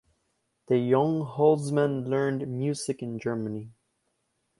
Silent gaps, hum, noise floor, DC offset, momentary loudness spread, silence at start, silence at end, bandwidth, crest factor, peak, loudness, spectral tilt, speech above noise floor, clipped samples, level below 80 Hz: none; none; -76 dBFS; under 0.1%; 9 LU; 0.7 s; 0.9 s; 11.5 kHz; 18 dB; -8 dBFS; -27 LUFS; -7 dB/octave; 50 dB; under 0.1%; -68 dBFS